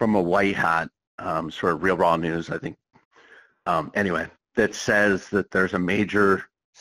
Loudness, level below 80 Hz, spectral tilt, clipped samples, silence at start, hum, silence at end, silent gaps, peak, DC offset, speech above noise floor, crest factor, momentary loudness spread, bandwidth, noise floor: -23 LUFS; -54 dBFS; -5.5 dB/octave; under 0.1%; 0 s; none; 0.35 s; 1.07-1.18 s, 3.05-3.11 s; -6 dBFS; under 0.1%; 31 dB; 18 dB; 10 LU; 14 kHz; -53 dBFS